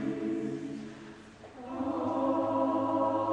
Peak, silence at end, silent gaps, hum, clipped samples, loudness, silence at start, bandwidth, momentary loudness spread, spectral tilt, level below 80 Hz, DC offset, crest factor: -16 dBFS; 0 s; none; none; under 0.1%; -32 LUFS; 0 s; 9.4 kHz; 19 LU; -7.5 dB/octave; -66 dBFS; under 0.1%; 16 dB